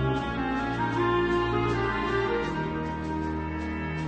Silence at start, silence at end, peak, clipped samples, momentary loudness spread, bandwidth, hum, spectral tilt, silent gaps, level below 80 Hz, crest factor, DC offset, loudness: 0 s; 0 s; -14 dBFS; under 0.1%; 6 LU; 8.8 kHz; none; -7 dB/octave; none; -40 dBFS; 14 dB; under 0.1%; -28 LUFS